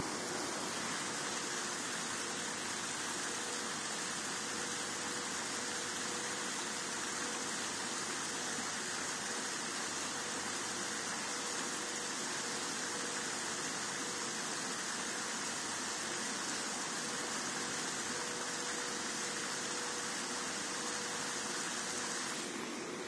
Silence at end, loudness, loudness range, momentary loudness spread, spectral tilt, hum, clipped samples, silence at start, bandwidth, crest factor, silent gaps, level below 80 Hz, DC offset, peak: 0 s; -37 LUFS; 0 LU; 1 LU; -1 dB/octave; none; under 0.1%; 0 s; 11 kHz; 14 dB; none; -80 dBFS; under 0.1%; -24 dBFS